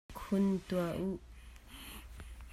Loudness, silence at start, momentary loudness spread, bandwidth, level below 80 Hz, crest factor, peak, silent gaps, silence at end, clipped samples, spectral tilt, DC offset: -36 LUFS; 0.1 s; 21 LU; 15 kHz; -54 dBFS; 16 dB; -22 dBFS; none; 0 s; under 0.1%; -7 dB/octave; under 0.1%